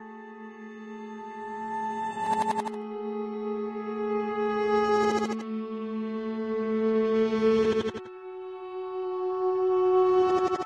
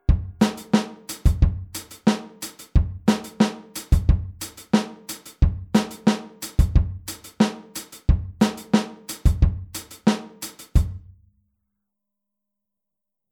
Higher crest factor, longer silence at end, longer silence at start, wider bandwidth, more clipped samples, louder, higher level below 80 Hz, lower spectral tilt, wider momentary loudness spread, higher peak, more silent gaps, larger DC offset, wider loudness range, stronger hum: second, 14 dB vs 20 dB; second, 0 s vs 2.35 s; about the same, 0 s vs 0.1 s; second, 11 kHz vs 19.5 kHz; neither; second, -28 LUFS vs -23 LUFS; second, -64 dBFS vs -26 dBFS; about the same, -6 dB/octave vs -6 dB/octave; first, 17 LU vs 14 LU; second, -14 dBFS vs -4 dBFS; neither; neither; first, 6 LU vs 3 LU; neither